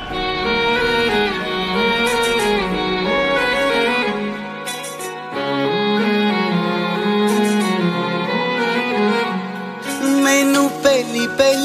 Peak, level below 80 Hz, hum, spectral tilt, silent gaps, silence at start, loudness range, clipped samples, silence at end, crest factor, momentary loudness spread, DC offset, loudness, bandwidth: -2 dBFS; -44 dBFS; none; -4 dB/octave; none; 0 s; 2 LU; under 0.1%; 0 s; 16 dB; 10 LU; under 0.1%; -18 LUFS; 15.5 kHz